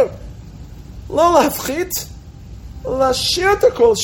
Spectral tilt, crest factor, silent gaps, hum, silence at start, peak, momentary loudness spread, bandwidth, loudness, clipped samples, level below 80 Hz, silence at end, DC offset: -3.5 dB/octave; 16 dB; none; none; 0 s; 0 dBFS; 24 LU; 17 kHz; -16 LUFS; under 0.1%; -36 dBFS; 0 s; under 0.1%